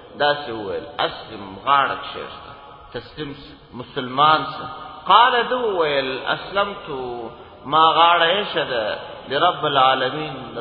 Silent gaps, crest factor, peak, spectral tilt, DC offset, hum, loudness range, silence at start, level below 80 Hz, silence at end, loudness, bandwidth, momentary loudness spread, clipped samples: none; 20 dB; 0 dBFS; -7 dB/octave; under 0.1%; none; 7 LU; 0 s; -54 dBFS; 0 s; -19 LUFS; 5.4 kHz; 21 LU; under 0.1%